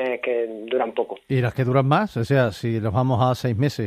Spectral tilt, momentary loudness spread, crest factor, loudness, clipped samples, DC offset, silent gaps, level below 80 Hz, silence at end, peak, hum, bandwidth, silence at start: -7.5 dB/octave; 6 LU; 16 dB; -22 LUFS; under 0.1%; under 0.1%; none; -54 dBFS; 0 s; -6 dBFS; none; 14.5 kHz; 0 s